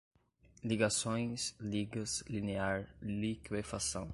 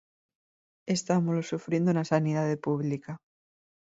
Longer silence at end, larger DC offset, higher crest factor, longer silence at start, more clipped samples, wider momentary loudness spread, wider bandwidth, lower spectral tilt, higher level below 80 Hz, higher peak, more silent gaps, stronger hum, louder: second, 0 s vs 0.8 s; neither; about the same, 20 dB vs 20 dB; second, 0.65 s vs 0.85 s; neither; second, 8 LU vs 13 LU; first, 11.5 kHz vs 8 kHz; second, -4 dB/octave vs -6.5 dB/octave; first, -58 dBFS vs -70 dBFS; second, -18 dBFS vs -10 dBFS; neither; neither; second, -37 LUFS vs -29 LUFS